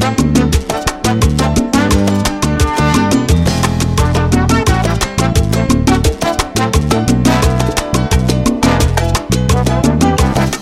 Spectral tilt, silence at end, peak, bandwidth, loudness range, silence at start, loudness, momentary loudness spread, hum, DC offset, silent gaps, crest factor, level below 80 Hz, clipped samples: -5.5 dB/octave; 0 s; 0 dBFS; 16 kHz; 0 LU; 0 s; -13 LUFS; 3 LU; none; under 0.1%; none; 12 dB; -20 dBFS; under 0.1%